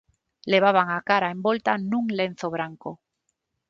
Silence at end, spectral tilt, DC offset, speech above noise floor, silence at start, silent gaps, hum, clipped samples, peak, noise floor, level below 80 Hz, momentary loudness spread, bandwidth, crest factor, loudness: 0.75 s; -6 dB/octave; under 0.1%; 54 dB; 0.45 s; none; none; under 0.1%; -4 dBFS; -78 dBFS; -68 dBFS; 16 LU; 7.6 kHz; 20 dB; -23 LUFS